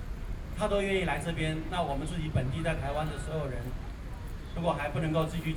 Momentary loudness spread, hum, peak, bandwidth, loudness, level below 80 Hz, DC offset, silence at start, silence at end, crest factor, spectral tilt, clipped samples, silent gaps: 12 LU; none; -16 dBFS; 18.5 kHz; -33 LUFS; -40 dBFS; under 0.1%; 0 s; 0 s; 16 dB; -6 dB/octave; under 0.1%; none